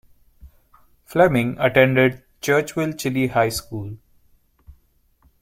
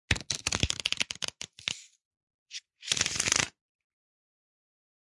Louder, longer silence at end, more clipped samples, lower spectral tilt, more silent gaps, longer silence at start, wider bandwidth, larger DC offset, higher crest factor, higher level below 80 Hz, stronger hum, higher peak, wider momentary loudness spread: first, -19 LUFS vs -29 LUFS; second, 0.7 s vs 1.7 s; neither; first, -5.5 dB/octave vs -1 dB/octave; second, none vs 2.05-2.11 s, 2.23-2.27 s, 2.34-2.46 s; first, 0.45 s vs 0.1 s; first, 16.5 kHz vs 11.5 kHz; neither; second, 20 dB vs 30 dB; about the same, -50 dBFS vs -50 dBFS; neither; first, -2 dBFS vs -6 dBFS; about the same, 13 LU vs 15 LU